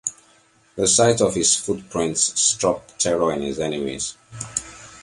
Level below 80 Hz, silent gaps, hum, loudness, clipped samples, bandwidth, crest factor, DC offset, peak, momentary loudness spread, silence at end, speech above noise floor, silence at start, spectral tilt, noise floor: -52 dBFS; none; none; -20 LUFS; under 0.1%; 11.5 kHz; 20 dB; under 0.1%; -4 dBFS; 13 LU; 0 s; 35 dB; 0.05 s; -2.5 dB/octave; -57 dBFS